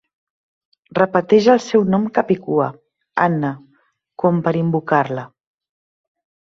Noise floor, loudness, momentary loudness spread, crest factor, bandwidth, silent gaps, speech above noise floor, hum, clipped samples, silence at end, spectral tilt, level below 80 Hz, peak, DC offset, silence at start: -61 dBFS; -18 LUFS; 12 LU; 18 dB; 7.6 kHz; none; 45 dB; none; under 0.1%; 1.25 s; -7 dB/octave; -60 dBFS; -2 dBFS; under 0.1%; 0.95 s